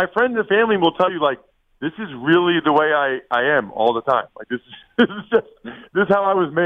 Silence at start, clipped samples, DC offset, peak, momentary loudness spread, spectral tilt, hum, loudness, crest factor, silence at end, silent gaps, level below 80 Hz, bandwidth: 0 s; under 0.1%; under 0.1%; -2 dBFS; 13 LU; -7.5 dB/octave; none; -19 LUFS; 16 dB; 0 s; none; -60 dBFS; 4.9 kHz